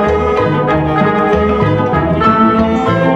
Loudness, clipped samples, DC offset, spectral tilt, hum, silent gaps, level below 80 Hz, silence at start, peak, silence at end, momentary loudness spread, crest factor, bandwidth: -12 LUFS; under 0.1%; under 0.1%; -8 dB/octave; none; none; -30 dBFS; 0 s; 0 dBFS; 0 s; 3 LU; 12 dB; 8 kHz